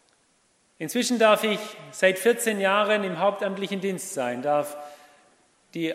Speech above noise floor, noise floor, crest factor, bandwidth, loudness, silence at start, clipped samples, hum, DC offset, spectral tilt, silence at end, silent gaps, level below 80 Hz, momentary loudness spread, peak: 41 dB; -65 dBFS; 20 dB; 16 kHz; -24 LUFS; 0.8 s; under 0.1%; none; under 0.1%; -3.5 dB/octave; 0 s; none; -82 dBFS; 16 LU; -6 dBFS